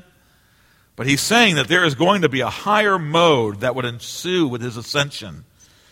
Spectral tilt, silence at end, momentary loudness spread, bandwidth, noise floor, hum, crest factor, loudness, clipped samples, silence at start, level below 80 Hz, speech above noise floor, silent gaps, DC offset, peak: -4 dB/octave; 0.5 s; 12 LU; 16.5 kHz; -56 dBFS; none; 18 dB; -18 LUFS; under 0.1%; 1 s; -54 dBFS; 38 dB; none; under 0.1%; -2 dBFS